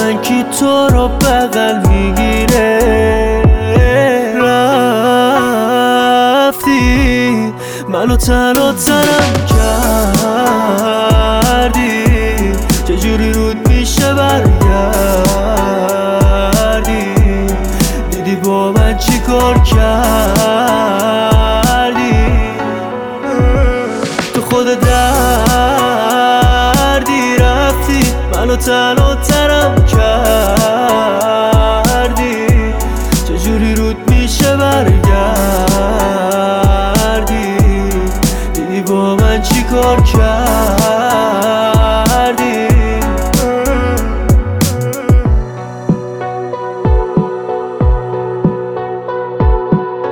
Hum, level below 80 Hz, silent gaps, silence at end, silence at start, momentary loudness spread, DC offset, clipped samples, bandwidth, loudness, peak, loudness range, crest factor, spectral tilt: none; -16 dBFS; none; 0 s; 0 s; 6 LU; under 0.1%; under 0.1%; over 20 kHz; -11 LUFS; 0 dBFS; 3 LU; 10 dB; -5 dB/octave